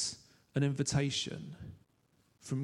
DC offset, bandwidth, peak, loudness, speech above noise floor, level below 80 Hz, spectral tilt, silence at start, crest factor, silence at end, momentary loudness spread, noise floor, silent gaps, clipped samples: under 0.1%; 11.5 kHz; -18 dBFS; -35 LUFS; 38 dB; -62 dBFS; -4.5 dB/octave; 0 s; 18 dB; 0 s; 20 LU; -72 dBFS; none; under 0.1%